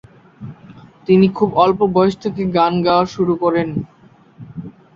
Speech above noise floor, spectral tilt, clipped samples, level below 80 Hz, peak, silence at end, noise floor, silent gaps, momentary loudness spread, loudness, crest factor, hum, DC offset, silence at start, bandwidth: 27 dB; -8 dB/octave; under 0.1%; -50 dBFS; -2 dBFS; 0.25 s; -42 dBFS; none; 22 LU; -16 LUFS; 16 dB; none; under 0.1%; 0.4 s; 7.2 kHz